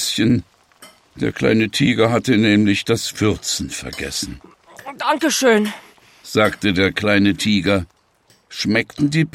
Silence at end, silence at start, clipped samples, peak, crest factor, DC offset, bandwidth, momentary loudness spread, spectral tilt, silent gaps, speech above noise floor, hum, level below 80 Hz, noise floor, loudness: 0.05 s; 0 s; under 0.1%; -2 dBFS; 18 dB; under 0.1%; 16 kHz; 11 LU; -4.5 dB/octave; none; 39 dB; none; -46 dBFS; -57 dBFS; -18 LUFS